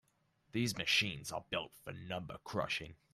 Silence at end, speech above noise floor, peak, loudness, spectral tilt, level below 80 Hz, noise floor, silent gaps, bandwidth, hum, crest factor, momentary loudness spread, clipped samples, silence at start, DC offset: 0.2 s; 36 dB; -20 dBFS; -37 LUFS; -3.5 dB/octave; -68 dBFS; -76 dBFS; none; 15 kHz; none; 20 dB; 12 LU; under 0.1%; 0.55 s; under 0.1%